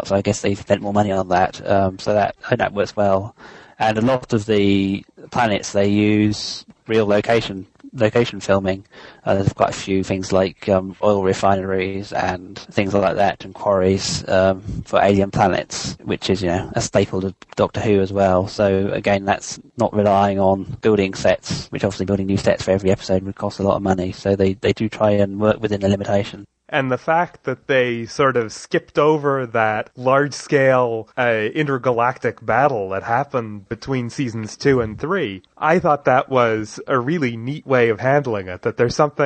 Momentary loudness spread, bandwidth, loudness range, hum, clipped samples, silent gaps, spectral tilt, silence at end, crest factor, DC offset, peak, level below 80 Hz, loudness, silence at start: 8 LU; 9 kHz; 2 LU; none; under 0.1%; none; -6 dB/octave; 0 s; 18 dB; under 0.1%; -2 dBFS; -48 dBFS; -19 LUFS; 0 s